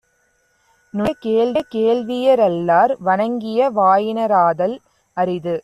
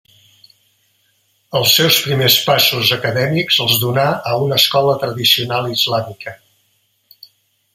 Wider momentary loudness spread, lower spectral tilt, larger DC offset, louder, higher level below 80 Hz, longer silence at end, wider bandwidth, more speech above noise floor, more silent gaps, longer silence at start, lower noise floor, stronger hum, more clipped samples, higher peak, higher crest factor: about the same, 8 LU vs 7 LU; first, -7 dB/octave vs -3 dB/octave; neither; second, -17 LUFS vs -13 LUFS; about the same, -58 dBFS vs -56 dBFS; second, 0 s vs 1.4 s; second, 13 kHz vs 16.5 kHz; about the same, 46 dB vs 47 dB; neither; second, 0.95 s vs 1.5 s; about the same, -63 dBFS vs -62 dBFS; neither; neither; about the same, -2 dBFS vs 0 dBFS; about the same, 14 dB vs 18 dB